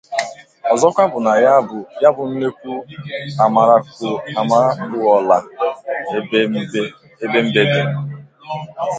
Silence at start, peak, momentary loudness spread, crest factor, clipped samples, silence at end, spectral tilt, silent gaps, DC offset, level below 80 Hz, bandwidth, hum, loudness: 0.1 s; 0 dBFS; 15 LU; 16 dB; under 0.1%; 0 s; -5.5 dB/octave; none; under 0.1%; -62 dBFS; 9.2 kHz; none; -16 LUFS